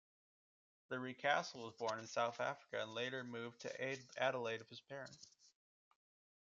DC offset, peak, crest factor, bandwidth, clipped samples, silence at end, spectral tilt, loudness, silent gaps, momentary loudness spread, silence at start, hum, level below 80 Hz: under 0.1%; -22 dBFS; 24 dB; 7.6 kHz; under 0.1%; 1.05 s; -2 dB/octave; -44 LUFS; none; 14 LU; 0.9 s; none; under -90 dBFS